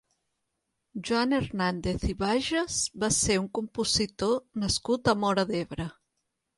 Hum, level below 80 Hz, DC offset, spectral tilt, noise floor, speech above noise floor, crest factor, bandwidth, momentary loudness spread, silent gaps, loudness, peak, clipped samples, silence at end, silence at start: none; -46 dBFS; under 0.1%; -3.5 dB/octave; -81 dBFS; 53 dB; 18 dB; 11.5 kHz; 8 LU; none; -28 LUFS; -10 dBFS; under 0.1%; 0.65 s; 0.95 s